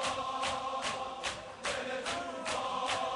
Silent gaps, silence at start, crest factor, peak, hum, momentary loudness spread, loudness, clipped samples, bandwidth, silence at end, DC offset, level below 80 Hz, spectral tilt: none; 0 s; 16 dB; -20 dBFS; none; 4 LU; -36 LUFS; under 0.1%; 11.5 kHz; 0 s; under 0.1%; -62 dBFS; -2 dB/octave